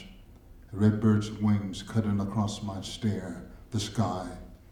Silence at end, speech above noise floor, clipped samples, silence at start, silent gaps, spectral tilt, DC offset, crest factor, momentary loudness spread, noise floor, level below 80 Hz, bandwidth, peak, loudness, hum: 0.15 s; 22 dB; under 0.1%; 0 s; none; -6.5 dB/octave; under 0.1%; 18 dB; 16 LU; -51 dBFS; -52 dBFS; 12 kHz; -12 dBFS; -29 LUFS; none